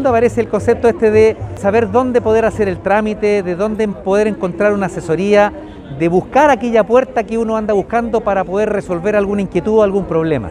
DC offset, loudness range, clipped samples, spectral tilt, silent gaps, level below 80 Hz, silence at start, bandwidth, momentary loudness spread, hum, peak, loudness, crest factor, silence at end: under 0.1%; 2 LU; under 0.1%; -7 dB/octave; none; -38 dBFS; 0 s; 11 kHz; 6 LU; none; 0 dBFS; -14 LUFS; 14 dB; 0 s